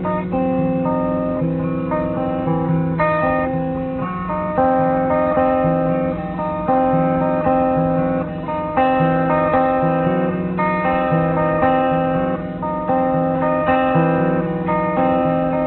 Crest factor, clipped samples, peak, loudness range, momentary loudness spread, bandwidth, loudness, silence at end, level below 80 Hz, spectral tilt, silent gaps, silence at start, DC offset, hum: 14 dB; under 0.1%; -4 dBFS; 2 LU; 6 LU; 4.2 kHz; -18 LUFS; 0 s; -40 dBFS; -12 dB/octave; none; 0 s; under 0.1%; none